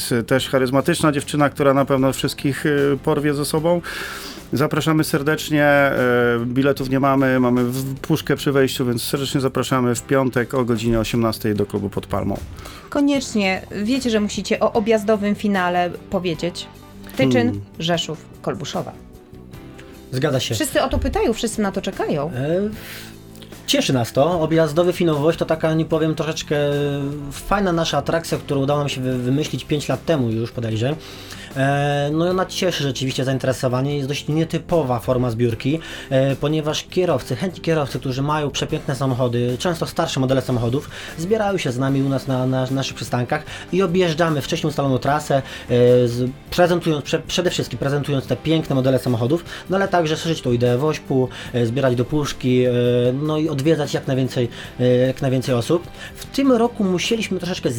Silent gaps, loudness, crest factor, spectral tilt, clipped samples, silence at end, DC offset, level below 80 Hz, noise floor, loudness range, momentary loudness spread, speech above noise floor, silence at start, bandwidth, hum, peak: none; -20 LUFS; 16 dB; -5.5 dB/octave; under 0.1%; 0 s; under 0.1%; -42 dBFS; -40 dBFS; 3 LU; 8 LU; 21 dB; 0 s; over 20 kHz; none; -2 dBFS